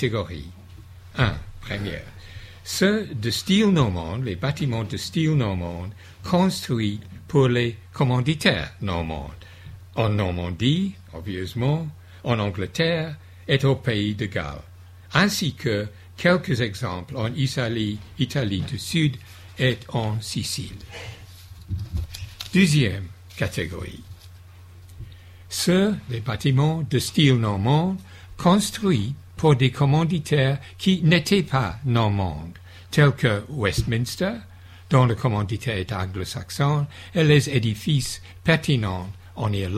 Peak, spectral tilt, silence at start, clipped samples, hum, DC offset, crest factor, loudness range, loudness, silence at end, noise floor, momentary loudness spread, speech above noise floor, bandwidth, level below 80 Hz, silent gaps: -2 dBFS; -5.5 dB/octave; 0 s; under 0.1%; none; under 0.1%; 20 dB; 5 LU; -23 LUFS; 0 s; -45 dBFS; 17 LU; 22 dB; 15 kHz; -44 dBFS; none